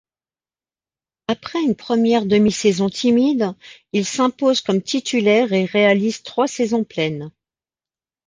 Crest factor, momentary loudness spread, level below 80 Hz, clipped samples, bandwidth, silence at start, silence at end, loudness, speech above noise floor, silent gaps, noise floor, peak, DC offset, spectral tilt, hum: 16 dB; 9 LU; -60 dBFS; under 0.1%; 9.8 kHz; 1.3 s; 1 s; -18 LUFS; over 72 dB; none; under -90 dBFS; -4 dBFS; under 0.1%; -5 dB/octave; none